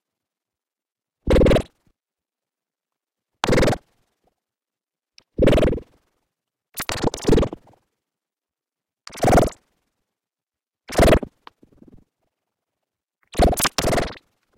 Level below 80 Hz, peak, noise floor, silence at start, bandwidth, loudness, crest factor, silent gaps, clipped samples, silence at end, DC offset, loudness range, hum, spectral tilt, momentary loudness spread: -30 dBFS; 0 dBFS; under -90 dBFS; 1.25 s; 17 kHz; -20 LUFS; 22 dB; none; under 0.1%; 0.45 s; under 0.1%; 5 LU; none; -5 dB/octave; 19 LU